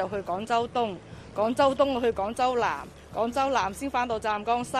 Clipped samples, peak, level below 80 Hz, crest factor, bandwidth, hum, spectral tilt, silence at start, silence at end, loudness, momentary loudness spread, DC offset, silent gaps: under 0.1%; -10 dBFS; -52 dBFS; 18 dB; 14.5 kHz; none; -4.5 dB/octave; 0 s; 0 s; -27 LUFS; 9 LU; under 0.1%; none